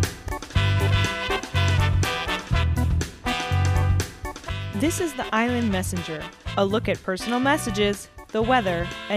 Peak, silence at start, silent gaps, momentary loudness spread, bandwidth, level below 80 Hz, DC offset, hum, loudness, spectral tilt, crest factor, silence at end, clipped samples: -8 dBFS; 0 s; none; 9 LU; 15.5 kHz; -34 dBFS; under 0.1%; none; -24 LUFS; -5 dB/octave; 16 dB; 0 s; under 0.1%